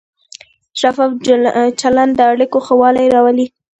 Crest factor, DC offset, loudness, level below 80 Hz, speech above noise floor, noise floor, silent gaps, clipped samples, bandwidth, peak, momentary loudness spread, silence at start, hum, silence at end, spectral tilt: 12 dB; under 0.1%; -12 LUFS; -52 dBFS; 29 dB; -40 dBFS; none; under 0.1%; 8.8 kHz; 0 dBFS; 6 LU; 0.75 s; none; 0.35 s; -4 dB/octave